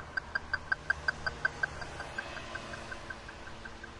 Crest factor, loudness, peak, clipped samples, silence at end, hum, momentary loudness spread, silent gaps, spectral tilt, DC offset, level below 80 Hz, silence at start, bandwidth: 22 dB; -37 LUFS; -16 dBFS; under 0.1%; 0 s; none; 12 LU; none; -3.5 dB/octave; under 0.1%; -54 dBFS; 0 s; 11.5 kHz